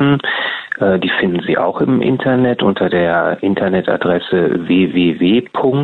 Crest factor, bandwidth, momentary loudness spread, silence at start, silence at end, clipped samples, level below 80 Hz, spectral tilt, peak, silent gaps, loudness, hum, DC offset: 12 dB; 4.4 kHz; 3 LU; 0 s; 0 s; under 0.1%; -50 dBFS; -9 dB/octave; -2 dBFS; none; -15 LUFS; none; under 0.1%